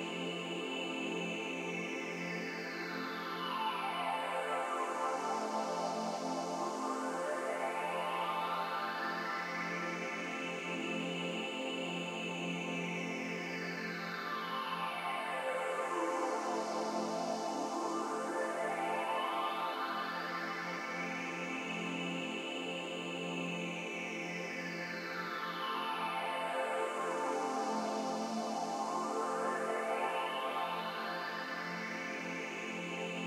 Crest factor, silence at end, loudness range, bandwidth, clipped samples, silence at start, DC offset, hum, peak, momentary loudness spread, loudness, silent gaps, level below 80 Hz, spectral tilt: 14 dB; 0 s; 2 LU; 16 kHz; under 0.1%; 0 s; under 0.1%; none; -24 dBFS; 4 LU; -38 LUFS; none; under -90 dBFS; -4 dB/octave